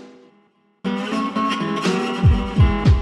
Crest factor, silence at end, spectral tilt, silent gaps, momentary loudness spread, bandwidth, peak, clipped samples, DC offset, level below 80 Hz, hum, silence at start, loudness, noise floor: 14 dB; 0 s; -7 dB/octave; none; 9 LU; 10.5 kHz; -4 dBFS; under 0.1%; under 0.1%; -26 dBFS; none; 0 s; -20 LUFS; -59 dBFS